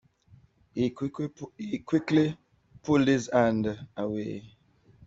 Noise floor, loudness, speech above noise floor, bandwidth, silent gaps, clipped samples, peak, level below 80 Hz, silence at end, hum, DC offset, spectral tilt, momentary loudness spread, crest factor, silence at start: -59 dBFS; -28 LUFS; 32 dB; 7.8 kHz; none; under 0.1%; -10 dBFS; -62 dBFS; 0.6 s; none; under 0.1%; -6.5 dB/octave; 16 LU; 20 dB; 0.75 s